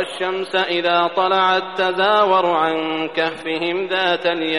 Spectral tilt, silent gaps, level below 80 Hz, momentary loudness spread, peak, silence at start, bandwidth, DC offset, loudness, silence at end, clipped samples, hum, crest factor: -4.5 dB/octave; none; -66 dBFS; 6 LU; -4 dBFS; 0 s; 11.5 kHz; 0.3%; -18 LUFS; 0 s; under 0.1%; none; 14 dB